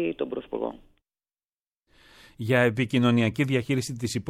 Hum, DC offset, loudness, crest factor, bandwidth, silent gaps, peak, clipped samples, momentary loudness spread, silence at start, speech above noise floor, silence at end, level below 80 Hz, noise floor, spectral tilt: none; under 0.1%; -25 LUFS; 18 dB; 15 kHz; 1.55-1.72 s; -10 dBFS; under 0.1%; 11 LU; 0 s; over 65 dB; 0 s; -60 dBFS; under -90 dBFS; -6 dB/octave